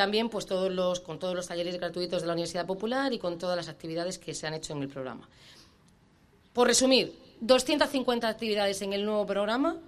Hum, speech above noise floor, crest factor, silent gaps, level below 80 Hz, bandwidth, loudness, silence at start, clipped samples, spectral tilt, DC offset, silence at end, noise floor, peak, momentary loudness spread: none; 33 dB; 22 dB; none; -62 dBFS; 13.5 kHz; -29 LUFS; 0 s; under 0.1%; -3.5 dB/octave; under 0.1%; 0 s; -62 dBFS; -8 dBFS; 12 LU